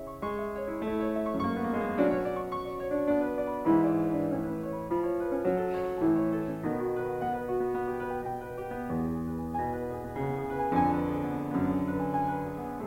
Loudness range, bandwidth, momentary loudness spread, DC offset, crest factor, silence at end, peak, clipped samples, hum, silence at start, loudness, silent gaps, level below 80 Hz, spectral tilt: 4 LU; 16 kHz; 8 LU; under 0.1%; 16 dB; 0 s; -14 dBFS; under 0.1%; none; 0 s; -31 LUFS; none; -52 dBFS; -8.5 dB/octave